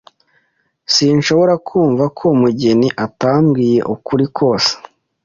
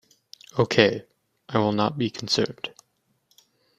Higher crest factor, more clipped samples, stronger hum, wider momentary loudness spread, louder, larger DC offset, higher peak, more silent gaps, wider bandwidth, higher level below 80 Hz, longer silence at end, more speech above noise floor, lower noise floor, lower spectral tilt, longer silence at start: second, 14 dB vs 24 dB; neither; neither; second, 5 LU vs 16 LU; first, -14 LUFS vs -24 LUFS; neither; first, 0 dBFS vs -4 dBFS; neither; second, 7.6 kHz vs 14.5 kHz; first, -52 dBFS vs -62 dBFS; second, 0.45 s vs 1.1 s; about the same, 49 dB vs 48 dB; second, -62 dBFS vs -71 dBFS; about the same, -5.5 dB/octave vs -5 dB/octave; first, 0.9 s vs 0.55 s